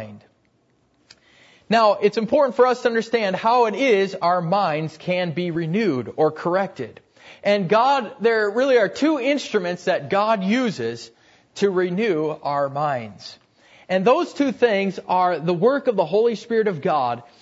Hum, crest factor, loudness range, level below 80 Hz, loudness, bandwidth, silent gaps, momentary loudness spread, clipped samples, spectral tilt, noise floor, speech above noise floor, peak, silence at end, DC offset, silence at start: none; 16 dB; 4 LU; -68 dBFS; -20 LUFS; 8 kHz; none; 7 LU; under 0.1%; -6 dB/octave; -63 dBFS; 43 dB; -4 dBFS; 0.2 s; under 0.1%; 0 s